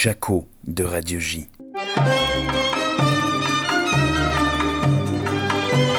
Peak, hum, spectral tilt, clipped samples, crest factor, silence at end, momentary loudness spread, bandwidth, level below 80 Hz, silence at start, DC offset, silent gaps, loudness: -6 dBFS; none; -4.5 dB/octave; under 0.1%; 16 dB; 0 s; 7 LU; 19.5 kHz; -38 dBFS; 0 s; under 0.1%; none; -21 LUFS